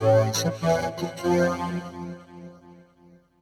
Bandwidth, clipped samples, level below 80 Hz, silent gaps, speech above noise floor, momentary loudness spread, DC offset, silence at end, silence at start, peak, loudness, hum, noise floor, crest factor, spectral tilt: 17.5 kHz; under 0.1%; -56 dBFS; none; 30 dB; 22 LU; under 0.1%; 0.65 s; 0 s; -10 dBFS; -25 LUFS; none; -56 dBFS; 16 dB; -5.5 dB/octave